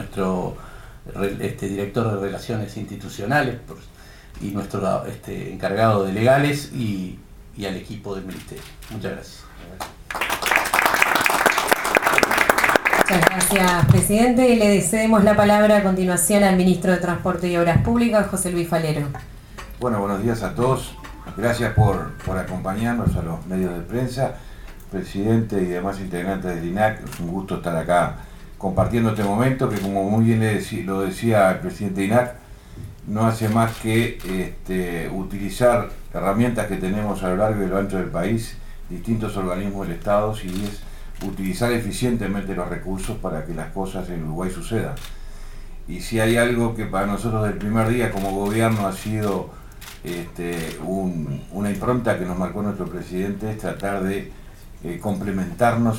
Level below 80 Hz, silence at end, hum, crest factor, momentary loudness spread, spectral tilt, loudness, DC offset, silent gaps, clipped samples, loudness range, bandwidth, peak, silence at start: -36 dBFS; 0 s; none; 22 dB; 17 LU; -5.5 dB/octave; -21 LUFS; under 0.1%; none; under 0.1%; 10 LU; 18 kHz; 0 dBFS; 0 s